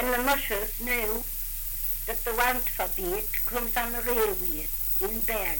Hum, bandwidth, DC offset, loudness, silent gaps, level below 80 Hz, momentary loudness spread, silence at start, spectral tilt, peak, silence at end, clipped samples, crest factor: none; 17 kHz; under 0.1%; -26 LUFS; none; -38 dBFS; 4 LU; 0 s; -2.5 dB/octave; -12 dBFS; 0 s; under 0.1%; 16 dB